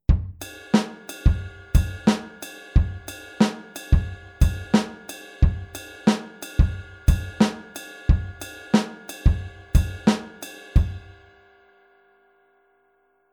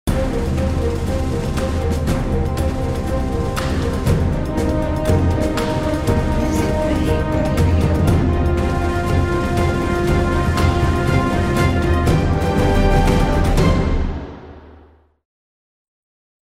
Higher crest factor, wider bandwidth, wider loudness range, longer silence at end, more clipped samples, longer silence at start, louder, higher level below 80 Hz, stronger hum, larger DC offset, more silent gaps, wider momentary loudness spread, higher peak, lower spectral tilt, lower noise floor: first, 20 dB vs 14 dB; first, 18.5 kHz vs 15.5 kHz; about the same, 3 LU vs 4 LU; first, 2.35 s vs 1.75 s; neither; about the same, 0.1 s vs 0.05 s; second, -24 LUFS vs -18 LUFS; about the same, -26 dBFS vs -22 dBFS; neither; neither; neither; first, 15 LU vs 5 LU; about the same, -4 dBFS vs -4 dBFS; about the same, -6.5 dB/octave vs -7 dB/octave; first, -65 dBFS vs -48 dBFS